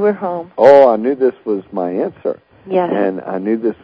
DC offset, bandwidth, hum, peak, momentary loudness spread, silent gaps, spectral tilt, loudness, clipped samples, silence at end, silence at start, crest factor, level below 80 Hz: under 0.1%; 8 kHz; none; 0 dBFS; 14 LU; none; -8 dB/octave; -15 LUFS; 0.6%; 0.1 s; 0 s; 14 dB; -60 dBFS